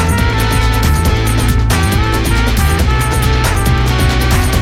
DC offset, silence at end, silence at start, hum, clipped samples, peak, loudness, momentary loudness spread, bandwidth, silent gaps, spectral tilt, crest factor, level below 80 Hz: under 0.1%; 0 s; 0 s; none; under 0.1%; 0 dBFS; -13 LUFS; 1 LU; 16.5 kHz; none; -5 dB/octave; 10 dB; -14 dBFS